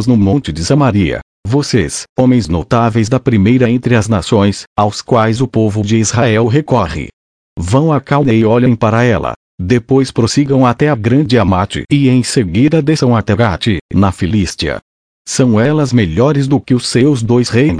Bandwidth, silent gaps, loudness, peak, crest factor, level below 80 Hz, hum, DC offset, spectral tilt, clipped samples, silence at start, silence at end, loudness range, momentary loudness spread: 10.5 kHz; 1.22-1.43 s, 2.09-2.16 s, 4.67-4.76 s, 7.13-7.56 s, 9.36-9.58 s, 13.81-13.89 s, 14.82-15.25 s; -12 LUFS; 0 dBFS; 12 dB; -34 dBFS; none; under 0.1%; -6 dB/octave; under 0.1%; 0 s; 0 s; 2 LU; 6 LU